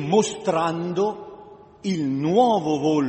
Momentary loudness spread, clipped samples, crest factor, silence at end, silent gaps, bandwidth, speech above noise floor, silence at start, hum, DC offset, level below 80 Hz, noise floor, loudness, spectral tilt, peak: 12 LU; under 0.1%; 18 dB; 0 s; none; 8.6 kHz; 23 dB; 0 s; none; under 0.1%; -62 dBFS; -44 dBFS; -22 LUFS; -6 dB/octave; -4 dBFS